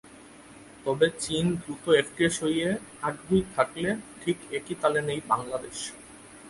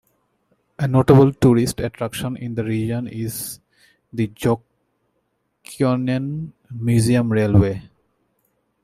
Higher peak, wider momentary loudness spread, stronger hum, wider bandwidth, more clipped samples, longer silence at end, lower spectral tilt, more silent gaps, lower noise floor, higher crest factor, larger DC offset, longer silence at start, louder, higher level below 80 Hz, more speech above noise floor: second, -8 dBFS vs -2 dBFS; second, 11 LU vs 17 LU; neither; second, 11.5 kHz vs 15.5 kHz; neither; second, 0 s vs 1 s; second, -4.5 dB/octave vs -7 dB/octave; neither; second, -49 dBFS vs -70 dBFS; about the same, 20 dB vs 20 dB; neither; second, 0.05 s vs 0.8 s; second, -28 LUFS vs -19 LUFS; second, -56 dBFS vs -46 dBFS; second, 22 dB vs 52 dB